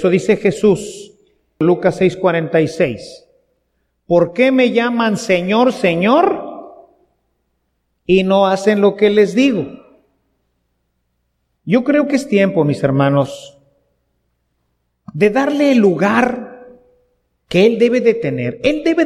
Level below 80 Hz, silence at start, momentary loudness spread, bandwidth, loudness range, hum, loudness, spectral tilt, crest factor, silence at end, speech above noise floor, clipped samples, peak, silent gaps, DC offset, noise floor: -52 dBFS; 0 s; 13 LU; 12.5 kHz; 4 LU; none; -14 LUFS; -6.5 dB/octave; 16 dB; 0 s; 54 dB; under 0.1%; 0 dBFS; none; under 0.1%; -68 dBFS